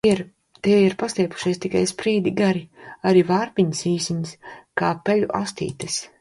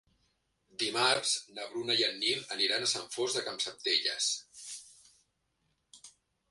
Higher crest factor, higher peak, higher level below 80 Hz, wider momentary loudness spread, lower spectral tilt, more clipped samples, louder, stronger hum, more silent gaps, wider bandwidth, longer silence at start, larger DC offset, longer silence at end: about the same, 16 dB vs 20 dB; first, -4 dBFS vs -14 dBFS; first, -58 dBFS vs -78 dBFS; second, 11 LU vs 16 LU; first, -5.5 dB/octave vs -0.5 dB/octave; neither; first, -22 LUFS vs -30 LUFS; neither; neither; about the same, 11.5 kHz vs 11.5 kHz; second, 0.05 s vs 0.8 s; neither; second, 0.15 s vs 0.4 s